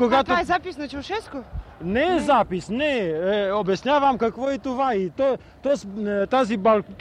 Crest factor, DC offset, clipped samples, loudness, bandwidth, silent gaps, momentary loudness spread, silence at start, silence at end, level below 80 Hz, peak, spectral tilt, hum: 16 dB; under 0.1%; under 0.1%; -23 LUFS; 11 kHz; none; 11 LU; 0 s; 0.05 s; -46 dBFS; -8 dBFS; -5.5 dB/octave; none